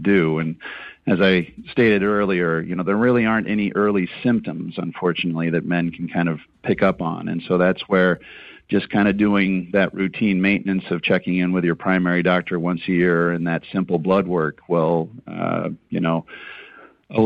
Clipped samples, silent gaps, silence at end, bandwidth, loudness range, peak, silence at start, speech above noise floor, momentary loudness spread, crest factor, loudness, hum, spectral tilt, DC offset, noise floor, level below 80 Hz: under 0.1%; none; 0 s; 5.2 kHz; 3 LU; -6 dBFS; 0 s; 26 dB; 10 LU; 14 dB; -20 LUFS; none; -9 dB/octave; under 0.1%; -45 dBFS; -52 dBFS